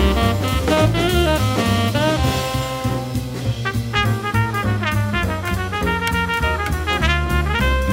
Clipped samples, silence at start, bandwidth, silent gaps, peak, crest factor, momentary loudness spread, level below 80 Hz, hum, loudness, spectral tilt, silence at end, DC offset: under 0.1%; 0 s; 16.5 kHz; none; -2 dBFS; 16 dB; 6 LU; -26 dBFS; none; -19 LUFS; -5.5 dB/octave; 0 s; under 0.1%